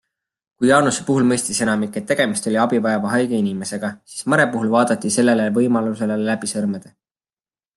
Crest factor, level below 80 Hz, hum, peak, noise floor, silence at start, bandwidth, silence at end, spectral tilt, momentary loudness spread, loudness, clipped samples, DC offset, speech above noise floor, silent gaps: 18 dB; -62 dBFS; none; -2 dBFS; under -90 dBFS; 0.6 s; 12.5 kHz; 0.9 s; -4.5 dB/octave; 8 LU; -19 LUFS; under 0.1%; under 0.1%; over 72 dB; none